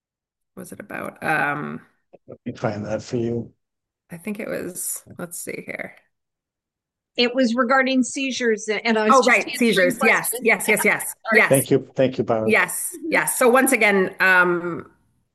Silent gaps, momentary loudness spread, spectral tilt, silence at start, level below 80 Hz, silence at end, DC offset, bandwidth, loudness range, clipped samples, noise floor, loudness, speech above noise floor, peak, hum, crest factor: none; 17 LU; -3.5 dB/octave; 0.55 s; -68 dBFS; 0.5 s; under 0.1%; 13 kHz; 12 LU; under 0.1%; -86 dBFS; -19 LUFS; 65 dB; -2 dBFS; none; 18 dB